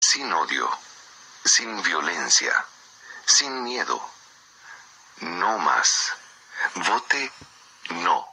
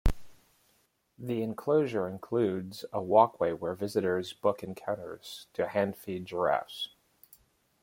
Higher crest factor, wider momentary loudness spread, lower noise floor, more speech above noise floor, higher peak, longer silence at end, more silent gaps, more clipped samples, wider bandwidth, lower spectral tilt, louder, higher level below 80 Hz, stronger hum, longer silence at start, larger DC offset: about the same, 22 dB vs 22 dB; first, 17 LU vs 13 LU; second, -51 dBFS vs -71 dBFS; second, 28 dB vs 41 dB; first, -4 dBFS vs -8 dBFS; second, 0 s vs 0.95 s; neither; neither; about the same, 15 kHz vs 16.5 kHz; second, 1 dB/octave vs -6.5 dB/octave; first, -22 LUFS vs -31 LUFS; second, -76 dBFS vs -44 dBFS; neither; about the same, 0 s vs 0.05 s; neither